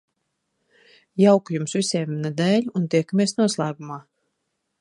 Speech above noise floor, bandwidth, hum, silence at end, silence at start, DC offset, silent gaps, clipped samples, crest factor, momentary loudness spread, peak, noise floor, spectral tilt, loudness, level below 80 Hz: 55 dB; 11.5 kHz; none; 0.8 s; 1.15 s; under 0.1%; none; under 0.1%; 20 dB; 16 LU; -4 dBFS; -76 dBFS; -5.5 dB/octave; -21 LUFS; -72 dBFS